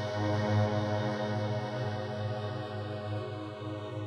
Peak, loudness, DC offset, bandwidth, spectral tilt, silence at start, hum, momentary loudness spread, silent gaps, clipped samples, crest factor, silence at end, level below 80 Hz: -18 dBFS; -34 LUFS; under 0.1%; 7.2 kHz; -7.5 dB/octave; 0 s; none; 10 LU; none; under 0.1%; 14 dB; 0 s; -64 dBFS